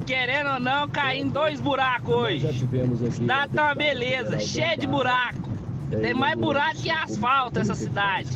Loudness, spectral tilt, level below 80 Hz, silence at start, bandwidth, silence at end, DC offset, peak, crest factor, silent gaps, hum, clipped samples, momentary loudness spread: -24 LUFS; -5.5 dB/octave; -50 dBFS; 0 s; 8.4 kHz; 0 s; under 0.1%; -10 dBFS; 14 dB; none; none; under 0.1%; 4 LU